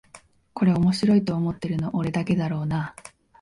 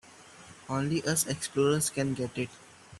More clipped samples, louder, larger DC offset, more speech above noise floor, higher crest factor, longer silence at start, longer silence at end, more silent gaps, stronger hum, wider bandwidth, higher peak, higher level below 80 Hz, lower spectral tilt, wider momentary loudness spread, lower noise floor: neither; first, -24 LUFS vs -30 LUFS; neither; first, 29 dB vs 22 dB; about the same, 14 dB vs 18 dB; about the same, 0.15 s vs 0.05 s; first, 0.35 s vs 0 s; neither; neither; second, 11.5 kHz vs 14 kHz; first, -10 dBFS vs -14 dBFS; first, -52 dBFS vs -64 dBFS; first, -7.5 dB/octave vs -4 dB/octave; second, 8 LU vs 19 LU; about the same, -52 dBFS vs -52 dBFS